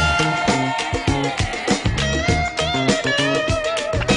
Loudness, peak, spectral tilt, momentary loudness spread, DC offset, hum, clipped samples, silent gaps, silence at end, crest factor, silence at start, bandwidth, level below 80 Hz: -19 LUFS; -2 dBFS; -4.5 dB/octave; 3 LU; under 0.1%; none; under 0.1%; none; 0 s; 16 dB; 0 s; 11 kHz; -32 dBFS